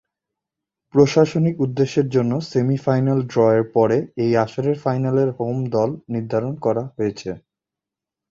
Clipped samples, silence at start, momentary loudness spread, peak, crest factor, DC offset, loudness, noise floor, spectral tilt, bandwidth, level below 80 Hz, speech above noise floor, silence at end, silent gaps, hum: under 0.1%; 0.95 s; 8 LU; -2 dBFS; 18 dB; under 0.1%; -20 LUFS; -87 dBFS; -7.5 dB/octave; 7.6 kHz; -56 dBFS; 68 dB; 0.95 s; none; none